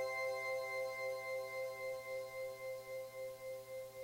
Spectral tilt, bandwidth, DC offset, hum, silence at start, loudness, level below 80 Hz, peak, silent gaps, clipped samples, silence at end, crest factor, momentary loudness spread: -2.5 dB/octave; 16 kHz; under 0.1%; none; 0 s; -44 LUFS; -80 dBFS; -32 dBFS; none; under 0.1%; 0 s; 12 dB; 8 LU